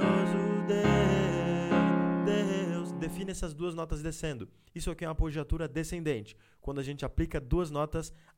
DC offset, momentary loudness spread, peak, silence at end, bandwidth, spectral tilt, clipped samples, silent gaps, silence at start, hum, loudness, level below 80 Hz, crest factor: under 0.1%; 12 LU; -12 dBFS; 0.2 s; 15.5 kHz; -6.5 dB/octave; under 0.1%; none; 0 s; none; -31 LUFS; -42 dBFS; 20 dB